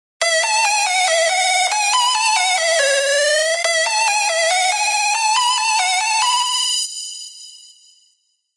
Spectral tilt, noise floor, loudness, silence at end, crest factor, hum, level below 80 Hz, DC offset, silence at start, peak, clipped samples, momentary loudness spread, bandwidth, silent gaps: 7.5 dB/octave; -63 dBFS; -15 LUFS; 1 s; 14 dB; none; -90 dBFS; under 0.1%; 0.2 s; -4 dBFS; under 0.1%; 3 LU; 11.5 kHz; none